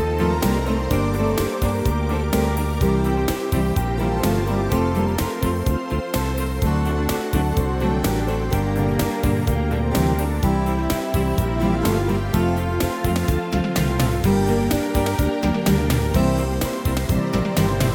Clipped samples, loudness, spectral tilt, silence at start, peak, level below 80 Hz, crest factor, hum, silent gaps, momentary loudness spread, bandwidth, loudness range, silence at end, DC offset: under 0.1%; -21 LUFS; -6.5 dB/octave; 0 s; -4 dBFS; -26 dBFS; 16 dB; none; none; 3 LU; 20 kHz; 2 LU; 0 s; under 0.1%